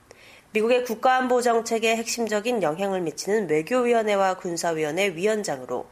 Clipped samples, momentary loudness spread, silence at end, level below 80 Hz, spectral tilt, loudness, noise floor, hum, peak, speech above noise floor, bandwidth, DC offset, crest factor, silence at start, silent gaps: under 0.1%; 6 LU; 0.05 s; -66 dBFS; -3.5 dB/octave; -24 LUFS; -50 dBFS; none; -8 dBFS; 27 dB; 15 kHz; under 0.1%; 16 dB; 0.55 s; none